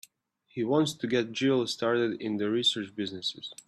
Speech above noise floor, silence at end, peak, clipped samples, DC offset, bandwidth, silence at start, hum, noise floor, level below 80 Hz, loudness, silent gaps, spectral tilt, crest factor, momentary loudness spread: 38 dB; 0.15 s; -14 dBFS; under 0.1%; under 0.1%; 14 kHz; 0.55 s; none; -67 dBFS; -74 dBFS; -29 LUFS; none; -4.5 dB/octave; 16 dB; 8 LU